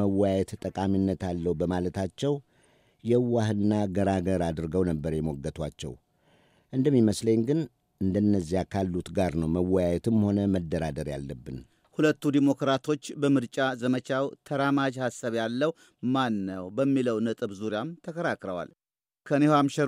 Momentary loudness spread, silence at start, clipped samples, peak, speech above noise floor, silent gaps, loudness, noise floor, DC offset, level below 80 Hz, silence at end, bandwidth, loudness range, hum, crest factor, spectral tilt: 10 LU; 0 s; under 0.1%; -10 dBFS; 38 dB; none; -28 LUFS; -64 dBFS; under 0.1%; -52 dBFS; 0 s; 14.5 kHz; 2 LU; none; 18 dB; -7 dB/octave